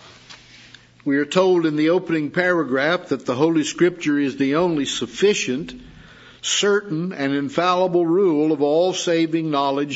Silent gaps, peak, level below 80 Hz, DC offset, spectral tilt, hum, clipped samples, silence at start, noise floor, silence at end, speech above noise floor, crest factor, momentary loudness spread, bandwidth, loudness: none; -4 dBFS; -58 dBFS; under 0.1%; -4.5 dB/octave; none; under 0.1%; 0.05 s; -47 dBFS; 0 s; 28 dB; 16 dB; 6 LU; 8 kHz; -20 LUFS